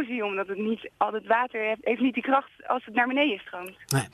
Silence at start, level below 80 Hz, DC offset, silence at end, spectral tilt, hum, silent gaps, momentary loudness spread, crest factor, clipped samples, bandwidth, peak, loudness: 0 s; -70 dBFS; under 0.1%; 0.05 s; -5 dB/octave; none; none; 7 LU; 20 dB; under 0.1%; 13.5 kHz; -6 dBFS; -27 LUFS